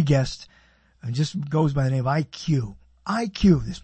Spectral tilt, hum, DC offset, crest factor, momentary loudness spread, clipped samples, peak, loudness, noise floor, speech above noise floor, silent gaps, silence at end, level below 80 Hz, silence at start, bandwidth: -7 dB/octave; none; under 0.1%; 18 dB; 16 LU; under 0.1%; -6 dBFS; -24 LUFS; -58 dBFS; 35 dB; none; 0.05 s; -42 dBFS; 0 s; 8.6 kHz